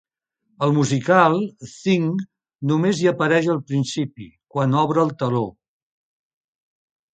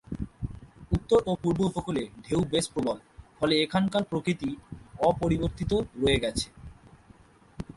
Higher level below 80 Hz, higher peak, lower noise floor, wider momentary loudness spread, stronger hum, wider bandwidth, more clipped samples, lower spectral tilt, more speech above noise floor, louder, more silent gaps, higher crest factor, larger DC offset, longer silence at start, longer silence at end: second, -62 dBFS vs -44 dBFS; first, 0 dBFS vs -10 dBFS; first, -71 dBFS vs -56 dBFS; about the same, 12 LU vs 14 LU; neither; second, 9.2 kHz vs 11.5 kHz; neither; about the same, -6.5 dB/octave vs -5.5 dB/octave; first, 51 dB vs 29 dB; first, -20 LUFS vs -28 LUFS; neither; about the same, 20 dB vs 20 dB; neither; first, 0.6 s vs 0.1 s; first, 1.65 s vs 0.05 s